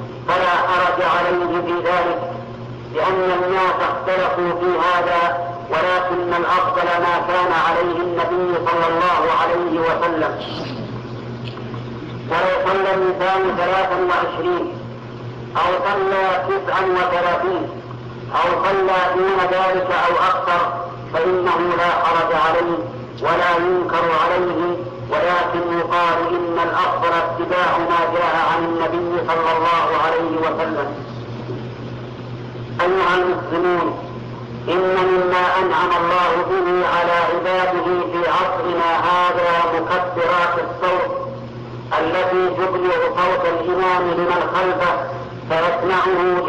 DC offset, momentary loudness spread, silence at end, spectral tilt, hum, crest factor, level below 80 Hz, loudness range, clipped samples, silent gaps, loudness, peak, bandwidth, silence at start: 0.1%; 12 LU; 0 s; -6 dB/octave; none; 10 dB; -48 dBFS; 3 LU; under 0.1%; none; -18 LUFS; -8 dBFS; 8.8 kHz; 0 s